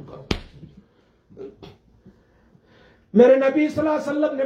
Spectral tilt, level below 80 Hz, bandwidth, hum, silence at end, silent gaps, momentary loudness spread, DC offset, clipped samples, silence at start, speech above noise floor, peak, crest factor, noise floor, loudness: -7 dB/octave; -48 dBFS; 8.6 kHz; none; 0 s; none; 26 LU; under 0.1%; under 0.1%; 0 s; 42 dB; -2 dBFS; 20 dB; -59 dBFS; -19 LUFS